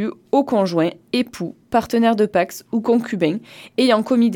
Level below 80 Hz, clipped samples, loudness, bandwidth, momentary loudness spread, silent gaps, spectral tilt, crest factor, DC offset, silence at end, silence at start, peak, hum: -60 dBFS; under 0.1%; -19 LUFS; 17.5 kHz; 7 LU; none; -6 dB/octave; 16 dB; under 0.1%; 0 s; 0 s; -4 dBFS; none